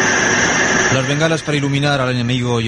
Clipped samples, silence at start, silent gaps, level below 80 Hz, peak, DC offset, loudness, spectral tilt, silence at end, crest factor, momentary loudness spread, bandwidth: under 0.1%; 0 s; none; -42 dBFS; -2 dBFS; under 0.1%; -15 LUFS; -4 dB/octave; 0 s; 14 dB; 5 LU; 11.5 kHz